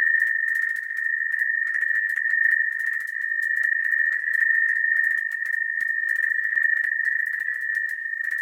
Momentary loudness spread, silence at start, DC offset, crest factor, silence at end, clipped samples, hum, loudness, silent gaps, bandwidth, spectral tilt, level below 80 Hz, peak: 6 LU; 0 s; under 0.1%; 14 dB; 0 s; under 0.1%; none; -22 LUFS; none; 16.5 kHz; 2 dB/octave; -84 dBFS; -8 dBFS